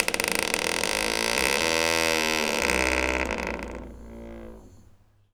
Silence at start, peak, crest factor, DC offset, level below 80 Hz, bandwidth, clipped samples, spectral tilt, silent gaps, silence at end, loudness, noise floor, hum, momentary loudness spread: 0 s; -2 dBFS; 26 dB; under 0.1%; -42 dBFS; over 20 kHz; under 0.1%; -2 dB/octave; none; 0.55 s; -24 LUFS; -56 dBFS; none; 20 LU